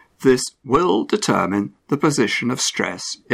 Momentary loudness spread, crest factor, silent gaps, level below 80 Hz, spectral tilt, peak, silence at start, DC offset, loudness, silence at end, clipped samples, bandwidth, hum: 7 LU; 18 dB; none; -52 dBFS; -4 dB/octave; -2 dBFS; 0.2 s; under 0.1%; -20 LUFS; 0 s; under 0.1%; 15.5 kHz; none